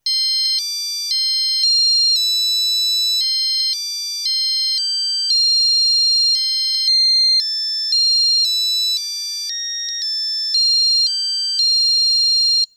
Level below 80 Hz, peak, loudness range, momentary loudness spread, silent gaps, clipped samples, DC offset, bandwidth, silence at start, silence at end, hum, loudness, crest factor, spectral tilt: -86 dBFS; -6 dBFS; 3 LU; 8 LU; none; under 0.1%; under 0.1%; 18 kHz; 0.05 s; 0.1 s; none; -14 LUFS; 10 dB; 9.5 dB/octave